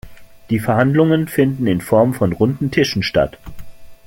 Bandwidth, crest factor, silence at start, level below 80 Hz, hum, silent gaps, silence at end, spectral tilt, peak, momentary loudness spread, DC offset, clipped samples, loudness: 17 kHz; 16 dB; 0.05 s; -42 dBFS; none; none; 0.15 s; -6.5 dB/octave; -2 dBFS; 5 LU; under 0.1%; under 0.1%; -16 LUFS